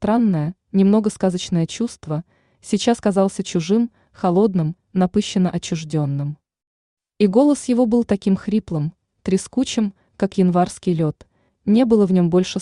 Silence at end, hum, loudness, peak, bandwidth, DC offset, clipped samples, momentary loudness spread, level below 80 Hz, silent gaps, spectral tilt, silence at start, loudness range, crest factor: 0 s; none; -19 LUFS; -4 dBFS; 11 kHz; under 0.1%; under 0.1%; 10 LU; -52 dBFS; 6.67-6.97 s; -6.5 dB/octave; 0 s; 2 LU; 16 dB